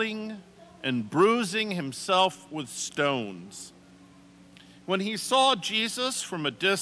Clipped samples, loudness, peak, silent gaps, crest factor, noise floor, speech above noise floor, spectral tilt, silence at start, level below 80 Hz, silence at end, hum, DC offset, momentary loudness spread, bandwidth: under 0.1%; -27 LUFS; -10 dBFS; none; 18 dB; -53 dBFS; 26 dB; -3 dB/octave; 0 s; -72 dBFS; 0 s; 60 Hz at -60 dBFS; under 0.1%; 18 LU; 11 kHz